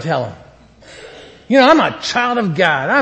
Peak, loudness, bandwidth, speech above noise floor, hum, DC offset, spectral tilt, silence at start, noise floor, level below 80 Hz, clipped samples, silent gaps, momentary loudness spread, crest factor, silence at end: 0 dBFS; -14 LUFS; 8.6 kHz; 28 dB; none; under 0.1%; -5 dB/octave; 0 s; -42 dBFS; -52 dBFS; under 0.1%; none; 13 LU; 16 dB; 0 s